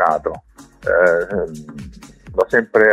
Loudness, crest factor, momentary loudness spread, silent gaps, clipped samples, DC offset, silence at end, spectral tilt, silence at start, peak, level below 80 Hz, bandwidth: -18 LUFS; 18 dB; 21 LU; none; under 0.1%; under 0.1%; 0 s; -6.5 dB/octave; 0 s; 0 dBFS; -44 dBFS; 12.5 kHz